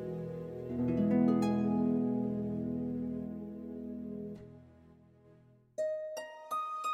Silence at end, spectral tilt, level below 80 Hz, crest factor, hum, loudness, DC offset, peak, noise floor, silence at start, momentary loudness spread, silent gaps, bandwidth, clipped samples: 0 s; -8 dB/octave; -62 dBFS; 18 dB; none; -35 LUFS; under 0.1%; -18 dBFS; -62 dBFS; 0 s; 15 LU; none; 13 kHz; under 0.1%